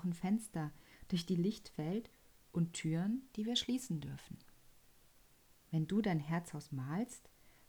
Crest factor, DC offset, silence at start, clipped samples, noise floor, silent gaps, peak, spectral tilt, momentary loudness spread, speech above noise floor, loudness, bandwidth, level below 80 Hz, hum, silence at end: 18 dB; under 0.1%; 0 s; under 0.1%; -67 dBFS; none; -22 dBFS; -5.5 dB/octave; 11 LU; 28 dB; -39 LUFS; over 20 kHz; -68 dBFS; none; 0.2 s